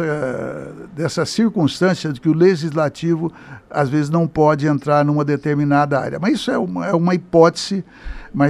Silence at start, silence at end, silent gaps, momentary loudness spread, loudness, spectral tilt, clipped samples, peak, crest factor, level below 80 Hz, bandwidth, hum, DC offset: 0 s; 0 s; none; 11 LU; -18 LUFS; -6.5 dB/octave; under 0.1%; 0 dBFS; 18 dB; -44 dBFS; 12 kHz; none; under 0.1%